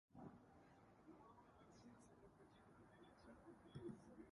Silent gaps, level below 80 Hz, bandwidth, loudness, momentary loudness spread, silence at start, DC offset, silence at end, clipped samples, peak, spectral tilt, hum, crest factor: none; -80 dBFS; 11 kHz; -65 LUFS; 11 LU; 0.1 s; under 0.1%; 0 s; under 0.1%; -44 dBFS; -7 dB/octave; none; 20 dB